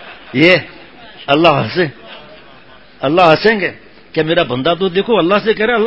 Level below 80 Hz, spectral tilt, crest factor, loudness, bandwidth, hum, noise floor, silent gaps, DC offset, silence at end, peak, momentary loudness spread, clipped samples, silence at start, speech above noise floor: -48 dBFS; -7 dB/octave; 14 dB; -13 LUFS; 8 kHz; none; -42 dBFS; none; 0.5%; 0 s; 0 dBFS; 12 LU; 0.2%; 0 s; 29 dB